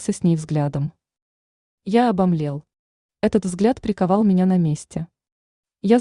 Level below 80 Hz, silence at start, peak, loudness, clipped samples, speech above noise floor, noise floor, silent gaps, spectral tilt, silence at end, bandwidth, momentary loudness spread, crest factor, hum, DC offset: -52 dBFS; 0 s; -4 dBFS; -20 LUFS; under 0.1%; over 71 dB; under -90 dBFS; 1.22-1.78 s, 2.79-3.09 s, 5.32-5.63 s; -7.5 dB/octave; 0 s; 11 kHz; 14 LU; 18 dB; none; under 0.1%